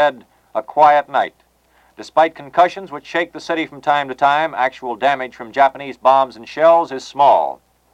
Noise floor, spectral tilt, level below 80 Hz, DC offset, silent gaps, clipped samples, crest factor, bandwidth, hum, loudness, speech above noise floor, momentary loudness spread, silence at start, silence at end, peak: -56 dBFS; -4.5 dB/octave; -62 dBFS; under 0.1%; none; under 0.1%; 16 dB; 9 kHz; none; -17 LUFS; 39 dB; 12 LU; 0 s; 0.4 s; 0 dBFS